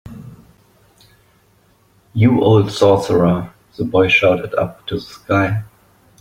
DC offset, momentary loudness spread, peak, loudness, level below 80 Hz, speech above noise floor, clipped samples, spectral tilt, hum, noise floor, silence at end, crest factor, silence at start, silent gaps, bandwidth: under 0.1%; 15 LU; -2 dBFS; -16 LUFS; -48 dBFS; 40 dB; under 0.1%; -7 dB/octave; none; -55 dBFS; 0.55 s; 16 dB; 0.05 s; none; 15 kHz